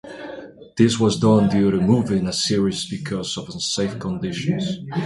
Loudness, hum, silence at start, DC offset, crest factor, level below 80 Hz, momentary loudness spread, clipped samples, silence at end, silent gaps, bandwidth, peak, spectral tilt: -20 LUFS; none; 0.05 s; under 0.1%; 18 dB; -48 dBFS; 14 LU; under 0.1%; 0 s; none; 11.5 kHz; -2 dBFS; -5.5 dB/octave